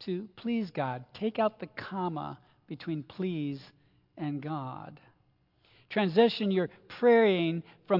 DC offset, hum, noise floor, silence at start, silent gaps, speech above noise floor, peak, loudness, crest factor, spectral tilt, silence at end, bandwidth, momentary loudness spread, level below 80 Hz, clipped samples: under 0.1%; none; -69 dBFS; 0 s; none; 40 dB; -12 dBFS; -30 LUFS; 20 dB; -8.5 dB/octave; 0 s; 5.8 kHz; 17 LU; -76 dBFS; under 0.1%